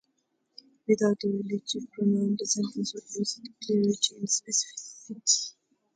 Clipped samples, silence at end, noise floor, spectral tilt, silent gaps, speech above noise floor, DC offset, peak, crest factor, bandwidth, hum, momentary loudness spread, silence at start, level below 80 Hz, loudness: under 0.1%; 0.45 s; -76 dBFS; -3.5 dB/octave; none; 47 dB; under 0.1%; -10 dBFS; 20 dB; 9.6 kHz; none; 12 LU; 0.9 s; -76 dBFS; -28 LUFS